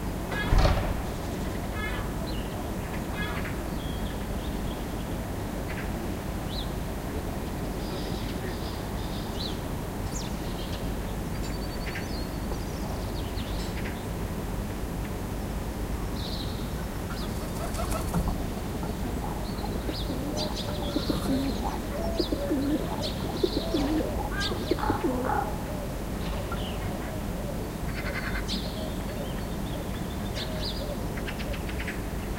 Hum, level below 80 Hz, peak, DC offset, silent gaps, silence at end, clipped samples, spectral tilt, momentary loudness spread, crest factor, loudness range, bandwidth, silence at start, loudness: none; -36 dBFS; -8 dBFS; under 0.1%; none; 0 s; under 0.1%; -5.5 dB/octave; 6 LU; 22 dB; 4 LU; 16 kHz; 0 s; -32 LUFS